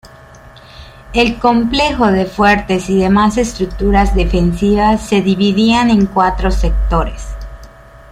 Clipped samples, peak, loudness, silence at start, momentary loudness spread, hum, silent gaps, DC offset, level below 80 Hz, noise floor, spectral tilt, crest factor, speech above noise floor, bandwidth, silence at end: under 0.1%; 0 dBFS; -13 LUFS; 0.05 s; 7 LU; none; none; under 0.1%; -22 dBFS; -38 dBFS; -6 dB/octave; 12 dB; 26 dB; 12 kHz; 0.45 s